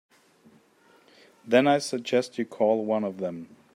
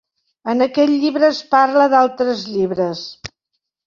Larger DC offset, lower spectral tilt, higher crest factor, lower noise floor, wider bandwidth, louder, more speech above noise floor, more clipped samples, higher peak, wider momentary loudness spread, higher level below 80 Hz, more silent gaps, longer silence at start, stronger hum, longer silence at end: neither; about the same, -5 dB/octave vs -5.5 dB/octave; about the same, 20 dB vs 16 dB; second, -60 dBFS vs -76 dBFS; first, 14.5 kHz vs 7.4 kHz; second, -25 LUFS vs -16 LUFS; second, 35 dB vs 60 dB; neither; second, -8 dBFS vs -2 dBFS; second, 13 LU vs 17 LU; second, -78 dBFS vs -58 dBFS; neither; first, 1.45 s vs 0.45 s; neither; second, 0.3 s vs 0.6 s